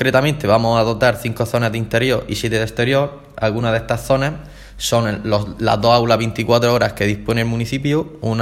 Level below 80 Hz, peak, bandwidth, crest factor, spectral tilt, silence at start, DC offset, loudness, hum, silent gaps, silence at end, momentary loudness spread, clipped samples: -40 dBFS; 0 dBFS; 16 kHz; 18 dB; -5.5 dB/octave; 0 s; under 0.1%; -17 LUFS; none; none; 0 s; 6 LU; under 0.1%